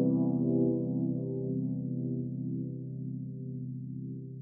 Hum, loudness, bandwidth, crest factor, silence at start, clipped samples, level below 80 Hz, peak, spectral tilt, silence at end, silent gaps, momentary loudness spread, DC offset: none; -34 LUFS; 1.2 kHz; 16 dB; 0 s; under 0.1%; -68 dBFS; -18 dBFS; -17.5 dB/octave; 0 s; none; 11 LU; under 0.1%